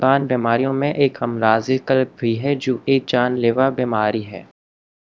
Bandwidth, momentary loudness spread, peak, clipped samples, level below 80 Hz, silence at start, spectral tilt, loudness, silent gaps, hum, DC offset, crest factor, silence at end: 7.4 kHz; 4 LU; 0 dBFS; under 0.1%; -62 dBFS; 0 s; -7 dB/octave; -19 LUFS; none; none; 0.1%; 18 dB; 0.7 s